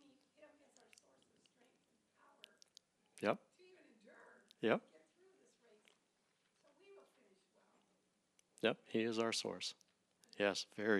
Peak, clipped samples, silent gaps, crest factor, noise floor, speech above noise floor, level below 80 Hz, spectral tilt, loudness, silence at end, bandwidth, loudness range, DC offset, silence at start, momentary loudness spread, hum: -20 dBFS; under 0.1%; none; 26 dB; -81 dBFS; 42 dB; under -90 dBFS; -3.5 dB/octave; -41 LUFS; 0 s; 13 kHz; 7 LU; under 0.1%; 0.4 s; 24 LU; none